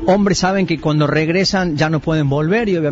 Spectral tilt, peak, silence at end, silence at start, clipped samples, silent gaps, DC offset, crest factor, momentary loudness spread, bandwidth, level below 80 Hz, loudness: -5.5 dB/octave; -2 dBFS; 0 s; 0 s; under 0.1%; none; under 0.1%; 12 dB; 3 LU; 8 kHz; -40 dBFS; -16 LUFS